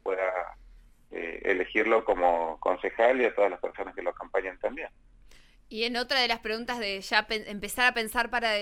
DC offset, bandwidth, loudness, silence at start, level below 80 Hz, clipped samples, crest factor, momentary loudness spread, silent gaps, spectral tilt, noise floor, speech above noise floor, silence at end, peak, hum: under 0.1%; 16.5 kHz; -28 LUFS; 0.05 s; -54 dBFS; under 0.1%; 22 dB; 11 LU; none; -2.5 dB/octave; -54 dBFS; 26 dB; 0 s; -6 dBFS; none